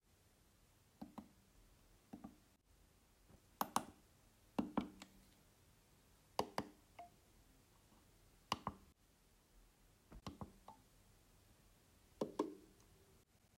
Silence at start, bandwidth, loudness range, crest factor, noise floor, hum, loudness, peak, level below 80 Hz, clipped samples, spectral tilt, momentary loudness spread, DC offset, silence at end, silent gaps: 1 s; 16 kHz; 13 LU; 32 dB; -73 dBFS; none; -48 LUFS; -20 dBFS; -72 dBFS; under 0.1%; -4.5 dB/octave; 24 LU; under 0.1%; 0.4 s; none